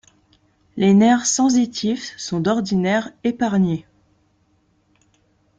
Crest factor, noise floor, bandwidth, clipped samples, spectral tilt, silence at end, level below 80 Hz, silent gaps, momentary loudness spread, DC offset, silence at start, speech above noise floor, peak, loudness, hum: 16 dB; -62 dBFS; 9.4 kHz; under 0.1%; -5 dB/octave; 1.75 s; -58 dBFS; none; 12 LU; under 0.1%; 0.75 s; 44 dB; -4 dBFS; -19 LUFS; none